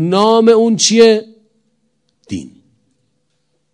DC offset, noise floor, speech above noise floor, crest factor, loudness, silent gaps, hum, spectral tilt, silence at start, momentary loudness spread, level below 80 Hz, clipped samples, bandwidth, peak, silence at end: under 0.1%; -66 dBFS; 56 dB; 14 dB; -10 LUFS; none; none; -4 dB/octave; 0 s; 19 LU; -62 dBFS; 0.4%; 11 kHz; 0 dBFS; 1.25 s